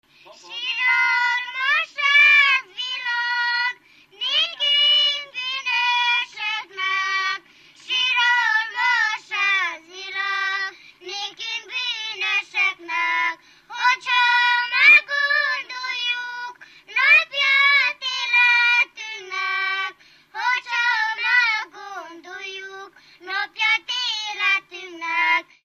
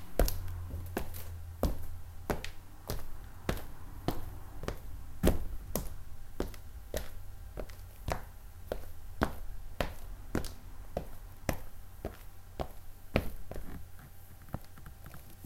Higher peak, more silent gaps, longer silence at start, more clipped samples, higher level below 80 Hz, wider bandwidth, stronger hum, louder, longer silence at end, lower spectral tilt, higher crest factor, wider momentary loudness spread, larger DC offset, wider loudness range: first, -4 dBFS vs -8 dBFS; neither; first, 0.3 s vs 0 s; neither; second, -78 dBFS vs -42 dBFS; second, 15 kHz vs 17 kHz; neither; first, -19 LUFS vs -41 LUFS; first, 0.25 s vs 0 s; second, 2 dB/octave vs -5.5 dB/octave; second, 18 dB vs 30 dB; about the same, 17 LU vs 15 LU; neither; first, 7 LU vs 4 LU